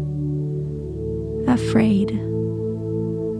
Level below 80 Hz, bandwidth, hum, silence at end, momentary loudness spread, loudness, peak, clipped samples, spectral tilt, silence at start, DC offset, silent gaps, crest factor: -40 dBFS; 10.5 kHz; none; 0 s; 10 LU; -23 LUFS; -6 dBFS; under 0.1%; -8 dB/octave; 0 s; under 0.1%; none; 16 dB